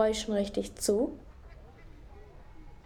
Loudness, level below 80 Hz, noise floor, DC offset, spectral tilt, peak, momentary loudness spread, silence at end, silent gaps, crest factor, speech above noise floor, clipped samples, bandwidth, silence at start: -31 LUFS; -50 dBFS; -50 dBFS; under 0.1%; -4 dB/octave; -14 dBFS; 25 LU; 0.1 s; none; 20 dB; 20 dB; under 0.1%; 18.5 kHz; 0 s